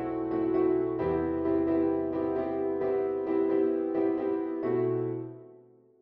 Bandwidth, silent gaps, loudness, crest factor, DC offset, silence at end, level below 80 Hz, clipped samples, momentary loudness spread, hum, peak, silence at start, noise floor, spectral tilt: 4.3 kHz; none; -29 LUFS; 12 dB; under 0.1%; 0.45 s; -58 dBFS; under 0.1%; 4 LU; none; -16 dBFS; 0 s; -57 dBFS; -11 dB/octave